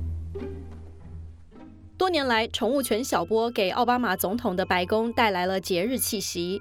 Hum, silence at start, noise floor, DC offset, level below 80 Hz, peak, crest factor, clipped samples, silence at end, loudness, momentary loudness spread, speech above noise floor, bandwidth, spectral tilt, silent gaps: none; 0 s; -47 dBFS; under 0.1%; -46 dBFS; -8 dBFS; 18 dB; under 0.1%; 0 s; -25 LUFS; 19 LU; 22 dB; 17.5 kHz; -4 dB/octave; none